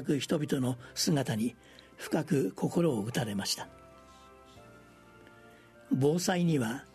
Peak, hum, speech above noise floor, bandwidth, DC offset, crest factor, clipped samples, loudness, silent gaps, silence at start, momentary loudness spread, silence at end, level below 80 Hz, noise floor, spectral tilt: -14 dBFS; none; 25 dB; 13.5 kHz; under 0.1%; 18 dB; under 0.1%; -31 LUFS; none; 0 s; 6 LU; 0.1 s; -66 dBFS; -56 dBFS; -5 dB/octave